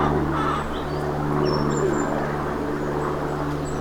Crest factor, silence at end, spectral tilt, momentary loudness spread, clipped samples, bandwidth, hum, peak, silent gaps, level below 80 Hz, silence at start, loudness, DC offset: 14 dB; 0 s; -6.5 dB/octave; 4 LU; under 0.1%; 19 kHz; none; -10 dBFS; none; -38 dBFS; 0 s; -24 LUFS; under 0.1%